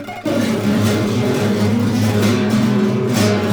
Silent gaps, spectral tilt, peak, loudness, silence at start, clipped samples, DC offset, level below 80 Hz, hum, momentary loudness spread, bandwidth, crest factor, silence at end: none; -6 dB/octave; -2 dBFS; -16 LUFS; 0 s; under 0.1%; under 0.1%; -50 dBFS; none; 2 LU; over 20 kHz; 14 dB; 0 s